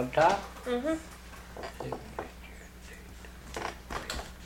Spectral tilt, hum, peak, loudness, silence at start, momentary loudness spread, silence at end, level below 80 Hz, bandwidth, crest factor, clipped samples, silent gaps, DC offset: -4.5 dB/octave; none; -12 dBFS; -34 LUFS; 0 s; 21 LU; 0 s; -48 dBFS; 17 kHz; 24 dB; under 0.1%; none; under 0.1%